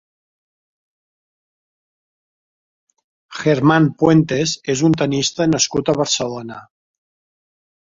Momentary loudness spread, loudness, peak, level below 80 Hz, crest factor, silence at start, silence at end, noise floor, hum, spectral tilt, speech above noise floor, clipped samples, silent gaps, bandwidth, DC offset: 14 LU; -16 LUFS; -2 dBFS; -54 dBFS; 18 dB; 3.3 s; 1.3 s; under -90 dBFS; none; -4.5 dB/octave; over 74 dB; under 0.1%; none; 7.8 kHz; under 0.1%